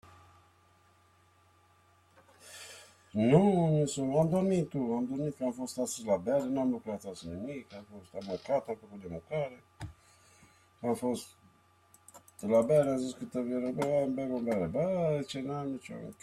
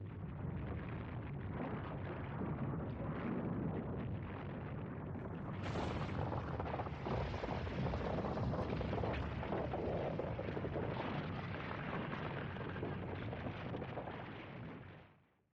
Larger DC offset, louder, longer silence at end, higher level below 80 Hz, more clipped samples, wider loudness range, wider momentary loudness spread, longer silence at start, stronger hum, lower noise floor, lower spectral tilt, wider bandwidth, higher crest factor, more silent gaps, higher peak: neither; first, -32 LUFS vs -43 LUFS; second, 0.1 s vs 0.4 s; second, -66 dBFS vs -54 dBFS; neither; first, 10 LU vs 4 LU; first, 20 LU vs 6 LU; about the same, 0.05 s vs 0 s; neither; about the same, -65 dBFS vs -68 dBFS; second, -7 dB/octave vs -8.5 dB/octave; first, 14 kHz vs 8 kHz; first, 22 dB vs 14 dB; neither; first, -12 dBFS vs -28 dBFS